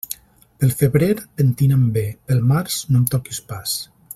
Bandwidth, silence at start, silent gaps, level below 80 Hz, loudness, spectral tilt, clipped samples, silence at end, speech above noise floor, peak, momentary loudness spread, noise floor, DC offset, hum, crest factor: 16.5 kHz; 0.1 s; none; -48 dBFS; -19 LUFS; -6 dB/octave; under 0.1%; 0.3 s; 19 dB; 0 dBFS; 10 LU; -37 dBFS; under 0.1%; none; 18 dB